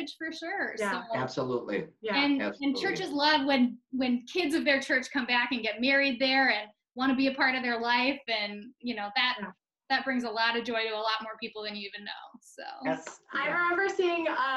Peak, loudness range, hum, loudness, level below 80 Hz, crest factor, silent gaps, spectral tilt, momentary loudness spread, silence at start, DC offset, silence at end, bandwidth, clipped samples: -12 dBFS; 5 LU; none; -29 LUFS; -72 dBFS; 18 dB; none; -4 dB/octave; 12 LU; 0 s; under 0.1%; 0 s; 12 kHz; under 0.1%